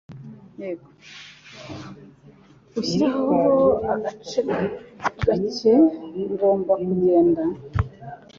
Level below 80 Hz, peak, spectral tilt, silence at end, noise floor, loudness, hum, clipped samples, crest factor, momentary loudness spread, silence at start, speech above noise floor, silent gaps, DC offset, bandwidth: -44 dBFS; -6 dBFS; -7 dB/octave; 0.2 s; -50 dBFS; -21 LUFS; none; under 0.1%; 16 dB; 23 LU; 0.1 s; 29 dB; none; under 0.1%; 7.4 kHz